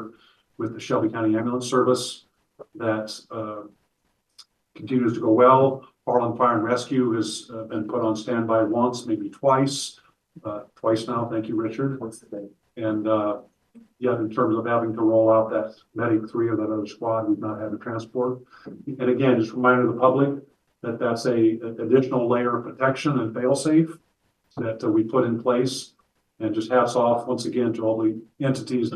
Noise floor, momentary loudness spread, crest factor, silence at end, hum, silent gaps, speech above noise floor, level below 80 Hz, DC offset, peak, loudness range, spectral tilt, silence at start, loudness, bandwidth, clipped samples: -72 dBFS; 14 LU; 20 dB; 0 s; none; none; 49 dB; -68 dBFS; under 0.1%; -4 dBFS; 5 LU; -6 dB/octave; 0 s; -23 LUFS; 12.5 kHz; under 0.1%